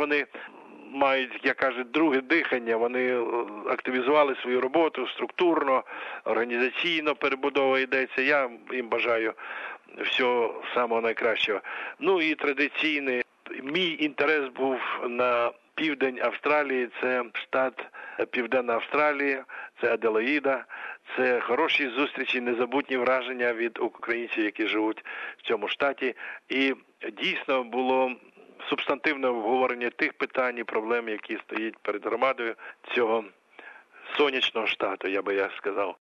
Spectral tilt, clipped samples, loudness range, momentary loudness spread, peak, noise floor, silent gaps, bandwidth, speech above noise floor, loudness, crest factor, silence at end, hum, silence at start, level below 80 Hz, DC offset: -5 dB/octave; under 0.1%; 3 LU; 9 LU; -8 dBFS; -49 dBFS; none; 7.4 kHz; 22 dB; -27 LUFS; 20 dB; 0.2 s; none; 0 s; -78 dBFS; under 0.1%